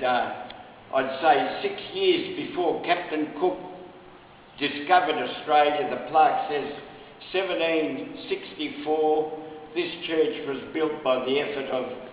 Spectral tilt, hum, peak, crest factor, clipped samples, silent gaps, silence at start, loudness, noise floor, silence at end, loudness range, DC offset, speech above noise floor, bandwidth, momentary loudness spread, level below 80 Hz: -8 dB/octave; none; -4 dBFS; 22 dB; under 0.1%; none; 0 s; -26 LUFS; -49 dBFS; 0 s; 3 LU; under 0.1%; 24 dB; 4 kHz; 14 LU; -64 dBFS